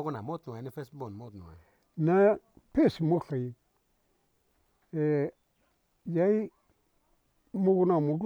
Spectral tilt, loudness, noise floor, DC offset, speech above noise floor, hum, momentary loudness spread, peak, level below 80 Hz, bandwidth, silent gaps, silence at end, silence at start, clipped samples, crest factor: -9.5 dB/octave; -29 LUFS; -73 dBFS; under 0.1%; 45 dB; none; 18 LU; -12 dBFS; -64 dBFS; 17 kHz; none; 0 s; 0 s; under 0.1%; 18 dB